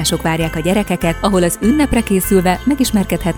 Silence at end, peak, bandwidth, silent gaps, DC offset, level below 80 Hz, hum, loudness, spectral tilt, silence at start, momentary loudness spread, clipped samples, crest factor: 0 s; 0 dBFS; over 20 kHz; none; under 0.1%; -30 dBFS; none; -15 LUFS; -5 dB/octave; 0 s; 3 LU; under 0.1%; 14 dB